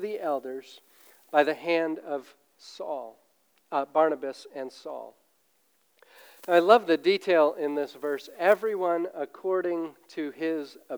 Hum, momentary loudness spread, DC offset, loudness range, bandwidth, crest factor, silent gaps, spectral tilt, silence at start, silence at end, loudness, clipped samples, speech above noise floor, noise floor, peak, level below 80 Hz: none; 17 LU; under 0.1%; 8 LU; over 20 kHz; 22 dB; none; -5 dB/octave; 0 s; 0 s; -27 LUFS; under 0.1%; 42 dB; -69 dBFS; -6 dBFS; under -90 dBFS